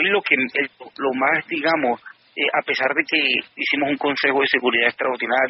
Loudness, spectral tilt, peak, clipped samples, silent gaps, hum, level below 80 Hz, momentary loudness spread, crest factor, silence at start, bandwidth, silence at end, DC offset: -20 LUFS; 0 dB/octave; -2 dBFS; under 0.1%; none; none; -70 dBFS; 7 LU; 20 dB; 0 s; 6 kHz; 0 s; under 0.1%